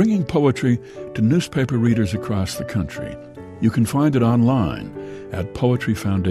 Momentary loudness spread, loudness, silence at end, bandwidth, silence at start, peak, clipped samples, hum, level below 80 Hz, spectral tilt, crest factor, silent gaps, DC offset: 14 LU; -20 LUFS; 0 s; 14.5 kHz; 0 s; -4 dBFS; under 0.1%; none; -44 dBFS; -7 dB/octave; 14 dB; none; under 0.1%